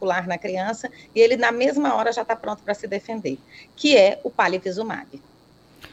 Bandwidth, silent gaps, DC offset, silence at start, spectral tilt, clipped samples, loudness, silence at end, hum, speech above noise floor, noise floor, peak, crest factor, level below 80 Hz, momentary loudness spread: 8.4 kHz; none; under 0.1%; 0 s; -4 dB/octave; under 0.1%; -21 LUFS; 0.05 s; none; 31 dB; -53 dBFS; -4 dBFS; 18 dB; -64 dBFS; 14 LU